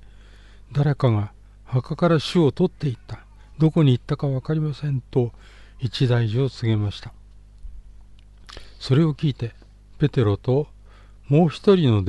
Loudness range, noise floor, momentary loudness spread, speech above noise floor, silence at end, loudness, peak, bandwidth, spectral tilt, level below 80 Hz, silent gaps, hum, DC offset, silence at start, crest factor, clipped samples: 4 LU; -46 dBFS; 17 LU; 25 dB; 0 s; -22 LUFS; -4 dBFS; 11 kHz; -8 dB/octave; -46 dBFS; none; 50 Hz at -45 dBFS; under 0.1%; 0.7 s; 18 dB; under 0.1%